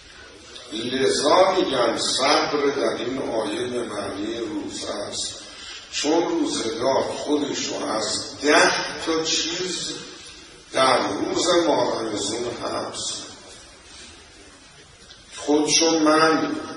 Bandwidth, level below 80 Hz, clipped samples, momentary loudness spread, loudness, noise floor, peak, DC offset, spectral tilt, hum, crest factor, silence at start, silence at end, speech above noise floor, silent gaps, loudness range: 11.5 kHz; -56 dBFS; under 0.1%; 22 LU; -22 LUFS; -48 dBFS; -2 dBFS; under 0.1%; -2.5 dB/octave; none; 20 dB; 0 s; 0 s; 26 dB; none; 7 LU